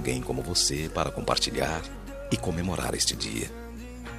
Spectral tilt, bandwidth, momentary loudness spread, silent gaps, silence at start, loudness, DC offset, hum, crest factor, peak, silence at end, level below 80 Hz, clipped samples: -3 dB/octave; 15 kHz; 16 LU; none; 0 s; -28 LUFS; under 0.1%; none; 22 dB; -8 dBFS; 0 s; -42 dBFS; under 0.1%